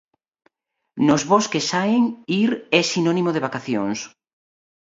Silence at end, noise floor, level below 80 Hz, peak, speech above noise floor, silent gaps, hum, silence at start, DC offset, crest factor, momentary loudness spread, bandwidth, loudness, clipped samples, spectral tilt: 0.8 s; -75 dBFS; -64 dBFS; 0 dBFS; 55 dB; none; none; 0.95 s; under 0.1%; 22 dB; 8 LU; 7.8 kHz; -20 LUFS; under 0.1%; -4.5 dB/octave